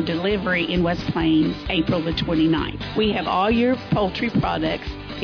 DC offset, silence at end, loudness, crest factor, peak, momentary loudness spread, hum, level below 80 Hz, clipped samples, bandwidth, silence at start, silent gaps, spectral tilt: under 0.1%; 0 s; -21 LUFS; 12 dB; -10 dBFS; 5 LU; none; -38 dBFS; under 0.1%; 5.4 kHz; 0 s; none; -7.5 dB/octave